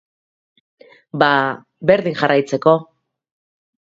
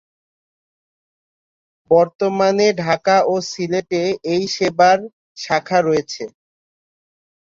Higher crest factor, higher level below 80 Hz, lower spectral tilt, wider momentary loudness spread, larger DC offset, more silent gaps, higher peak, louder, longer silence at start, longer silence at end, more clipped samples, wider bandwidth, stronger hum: about the same, 20 dB vs 18 dB; about the same, -62 dBFS vs -62 dBFS; first, -6 dB/octave vs -4.5 dB/octave; second, 7 LU vs 10 LU; neither; second, none vs 2.15-2.19 s, 5.13-5.35 s; about the same, 0 dBFS vs -2 dBFS; about the same, -17 LUFS vs -17 LUFS; second, 1.15 s vs 1.9 s; about the same, 1.15 s vs 1.25 s; neither; about the same, 7.8 kHz vs 7.8 kHz; neither